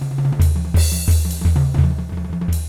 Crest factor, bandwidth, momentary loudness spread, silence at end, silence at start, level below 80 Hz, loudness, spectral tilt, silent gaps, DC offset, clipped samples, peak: 12 dB; 16.5 kHz; 7 LU; 0 s; 0 s; -24 dBFS; -18 LUFS; -6 dB/octave; none; under 0.1%; under 0.1%; -4 dBFS